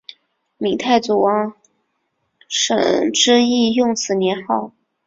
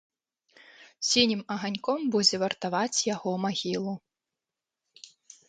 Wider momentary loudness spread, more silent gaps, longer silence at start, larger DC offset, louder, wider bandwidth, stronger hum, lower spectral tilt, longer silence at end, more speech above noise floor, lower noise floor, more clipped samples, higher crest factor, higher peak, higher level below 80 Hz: about the same, 10 LU vs 9 LU; neither; second, 0.6 s vs 0.8 s; neither; first, -17 LUFS vs -27 LUFS; second, 7.8 kHz vs 9.6 kHz; neither; about the same, -3 dB/octave vs -3 dB/octave; about the same, 0.35 s vs 0.4 s; second, 54 dB vs 61 dB; second, -70 dBFS vs -89 dBFS; neither; about the same, 18 dB vs 22 dB; first, -2 dBFS vs -8 dBFS; first, -60 dBFS vs -70 dBFS